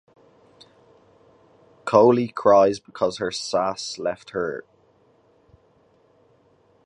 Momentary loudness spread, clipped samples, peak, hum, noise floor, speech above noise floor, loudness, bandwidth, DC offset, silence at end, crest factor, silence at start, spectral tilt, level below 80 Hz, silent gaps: 13 LU; under 0.1%; -2 dBFS; none; -60 dBFS; 39 dB; -21 LUFS; 10.5 kHz; under 0.1%; 2.25 s; 22 dB; 1.85 s; -5 dB/octave; -64 dBFS; none